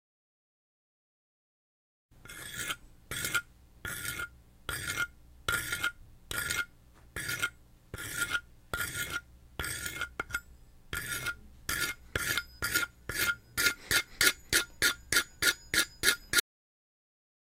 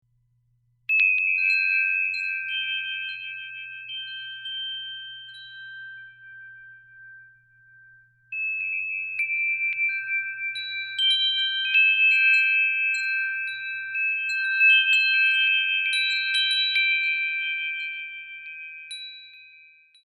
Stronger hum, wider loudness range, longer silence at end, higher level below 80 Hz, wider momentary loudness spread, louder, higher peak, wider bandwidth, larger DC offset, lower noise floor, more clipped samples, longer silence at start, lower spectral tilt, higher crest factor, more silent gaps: second, none vs 60 Hz at -70 dBFS; second, 10 LU vs 15 LU; first, 1 s vs 0.55 s; first, -54 dBFS vs -76 dBFS; second, 14 LU vs 20 LU; second, -32 LUFS vs -21 LUFS; about the same, -8 dBFS vs -8 dBFS; first, 16.5 kHz vs 12 kHz; neither; second, -57 dBFS vs -67 dBFS; neither; first, 2.2 s vs 0.9 s; first, -0.5 dB/octave vs 4.5 dB/octave; first, 28 dB vs 16 dB; neither